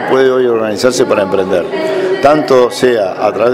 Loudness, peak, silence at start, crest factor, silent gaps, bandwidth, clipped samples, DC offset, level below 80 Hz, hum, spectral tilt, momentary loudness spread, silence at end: -11 LUFS; 0 dBFS; 0 s; 10 dB; none; 15 kHz; 0.3%; under 0.1%; -48 dBFS; none; -4.5 dB/octave; 5 LU; 0 s